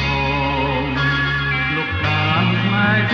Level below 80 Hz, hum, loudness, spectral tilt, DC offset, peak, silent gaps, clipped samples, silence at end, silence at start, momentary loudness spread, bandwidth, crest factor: -34 dBFS; none; -18 LUFS; -6.5 dB/octave; under 0.1%; -4 dBFS; none; under 0.1%; 0 s; 0 s; 3 LU; 7 kHz; 14 dB